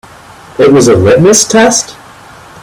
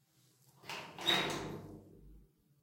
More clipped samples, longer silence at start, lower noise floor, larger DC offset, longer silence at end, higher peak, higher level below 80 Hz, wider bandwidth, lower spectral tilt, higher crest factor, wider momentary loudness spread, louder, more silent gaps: first, 0.3% vs under 0.1%; about the same, 0.6 s vs 0.65 s; second, -33 dBFS vs -69 dBFS; neither; first, 0.7 s vs 0.4 s; first, 0 dBFS vs -18 dBFS; first, -40 dBFS vs -66 dBFS; first, over 20 kHz vs 16.5 kHz; about the same, -4 dB/octave vs -3 dB/octave; second, 8 dB vs 24 dB; second, 11 LU vs 22 LU; first, -6 LUFS vs -36 LUFS; neither